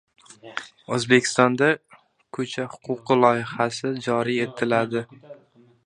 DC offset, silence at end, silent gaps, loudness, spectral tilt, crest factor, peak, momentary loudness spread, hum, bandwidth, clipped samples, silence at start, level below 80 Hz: under 0.1%; 0.5 s; none; -22 LUFS; -4.5 dB/octave; 24 dB; 0 dBFS; 16 LU; none; 11.5 kHz; under 0.1%; 0.45 s; -68 dBFS